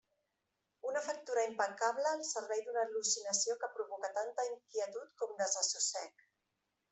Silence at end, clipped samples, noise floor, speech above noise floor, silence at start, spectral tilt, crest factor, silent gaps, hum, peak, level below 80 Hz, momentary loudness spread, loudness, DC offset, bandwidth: 0.8 s; under 0.1%; -86 dBFS; 48 dB; 0.85 s; 0.5 dB/octave; 20 dB; none; none; -20 dBFS; under -90 dBFS; 9 LU; -37 LUFS; under 0.1%; 8.4 kHz